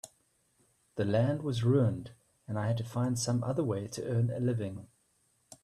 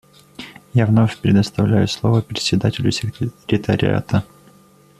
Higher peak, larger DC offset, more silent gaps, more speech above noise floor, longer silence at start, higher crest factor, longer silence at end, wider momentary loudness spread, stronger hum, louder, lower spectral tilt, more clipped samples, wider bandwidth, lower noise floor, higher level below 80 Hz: second, -16 dBFS vs -2 dBFS; neither; neither; first, 42 dB vs 33 dB; second, 0.05 s vs 0.4 s; about the same, 16 dB vs 16 dB; second, 0.1 s vs 0.75 s; first, 14 LU vs 11 LU; neither; second, -32 LUFS vs -18 LUFS; about the same, -6.5 dB/octave vs -6.5 dB/octave; neither; about the same, 13 kHz vs 13 kHz; first, -73 dBFS vs -50 dBFS; second, -66 dBFS vs -46 dBFS